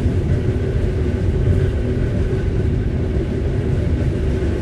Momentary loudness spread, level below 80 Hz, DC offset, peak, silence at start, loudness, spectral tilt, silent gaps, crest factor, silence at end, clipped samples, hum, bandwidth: 3 LU; -22 dBFS; under 0.1%; -4 dBFS; 0 s; -20 LUFS; -9 dB/octave; none; 14 dB; 0 s; under 0.1%; none; 9.8 kHz